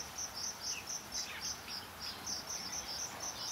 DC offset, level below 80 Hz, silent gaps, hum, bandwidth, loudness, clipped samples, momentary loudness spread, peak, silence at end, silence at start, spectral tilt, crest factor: under 0.1%; -64 dBFS; none; none; 16 kHz; -40 LUFS; under 0.1%; 3 LU; -26 dBFS; 0 s; 0 s; 0 dB/octave; 16 dB